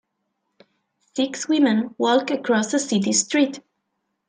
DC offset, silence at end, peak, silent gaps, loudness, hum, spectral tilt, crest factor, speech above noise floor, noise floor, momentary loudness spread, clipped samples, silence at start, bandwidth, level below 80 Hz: under 0.1%; 0.7 s; -6 dBFS; none; -21 LUFS; none; -3.5 dB/octave; 16 dB; 55 dB; -76 dBFS; 7 LU; under 0.1%; 1.15 s; 10 kHz; -74 dBFS